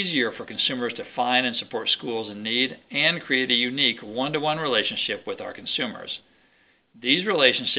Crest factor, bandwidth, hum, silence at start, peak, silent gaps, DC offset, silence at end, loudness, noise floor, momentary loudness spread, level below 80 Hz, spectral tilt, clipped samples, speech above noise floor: 22 dB; 5.4 kHz; none; 0 s; -2 dBFS; none; under 0.1%; 0 s; -24 LUFS; -62 dBFS; 10 LU; -70 dBFS; -8 dB/octave; under 0.1%; 37 dB